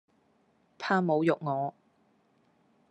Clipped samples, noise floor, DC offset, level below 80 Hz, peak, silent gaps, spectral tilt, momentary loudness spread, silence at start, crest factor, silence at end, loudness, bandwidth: under 0.1%; -69 dBFS; under 0.1%; -86 dBFS; -12 dBFS; none; -7.5 dB/octave; 11 LU; 0.8 s; 20 dB; 1.2 s; -29 LUFS; 8.6 kHz